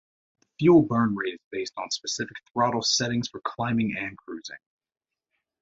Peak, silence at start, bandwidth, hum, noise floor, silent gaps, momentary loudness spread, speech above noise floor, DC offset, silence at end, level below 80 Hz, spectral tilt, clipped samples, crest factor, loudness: -6 dBFS; 0.6 s; 8 kHz; none; -81 dBFS; 1.44-1.51 s; 15 LU; 56 dB; under 0.1%; 1.05 s; -62 dBFS; -4.5 dB/octave; under 0.1%; 20 dB; -25 LUFS